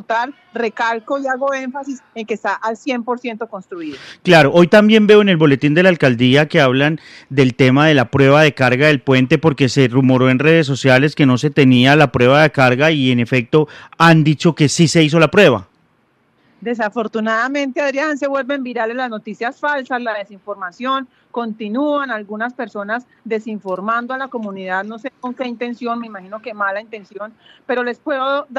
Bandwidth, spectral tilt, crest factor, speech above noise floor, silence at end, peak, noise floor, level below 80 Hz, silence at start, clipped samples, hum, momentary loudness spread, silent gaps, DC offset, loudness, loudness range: 13 kHz; -6 dB/octave; 14 dB; 44 dB; 0 s; 0 dBFS; -59 dBFS; -54 dBFS; 0.1 s; under 0.1%; none; 16 LU; none; under 0.1%; -15 LUFS; 11 LU